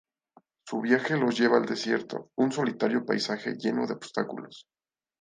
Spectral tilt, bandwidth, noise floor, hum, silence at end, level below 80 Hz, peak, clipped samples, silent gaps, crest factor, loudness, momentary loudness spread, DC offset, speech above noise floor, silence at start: -5 dB/octave; 9.6 kHz; -63 dBFS; none; 0.6 s; -76 dBFS; -6 dBFS; under 0.1%; none; 22 dB; -28 LUFS; 11 LU; under 0.1%; 36 dB; 0.65 s